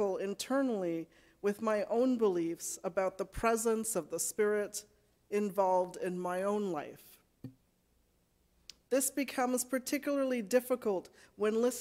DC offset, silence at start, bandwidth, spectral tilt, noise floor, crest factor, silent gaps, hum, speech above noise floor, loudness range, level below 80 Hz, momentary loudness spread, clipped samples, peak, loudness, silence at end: under 0.1%; 0 s; 16 kHz; -4 dB/octave; -73 dBFS; 18 dB; none; none; 40 dB; 5 LU; -64 dBFS; 9 LU; under 0.1%; -16 dBFS; -34 LUFS; 0 s